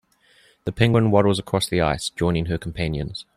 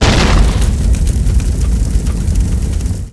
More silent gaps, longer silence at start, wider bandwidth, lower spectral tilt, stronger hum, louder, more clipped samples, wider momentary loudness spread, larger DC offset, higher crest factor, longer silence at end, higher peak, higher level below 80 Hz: neither; first, 0.65 s vs 0 s; first, 14.5 kHz vs 11 kHz; about the same, -6 dB/octave vs -5.5 dB/octave; neither; second, -21 LUFS vs -15 LUFS; neither; first, 11 LU vs 6 LU; neither; first, 20 dB vs 12 dB; first, 0.15 s vs 0 s; about the same, -2 dBFS vs 0 dBFS; second, -42 dBFS vs -12 dBFS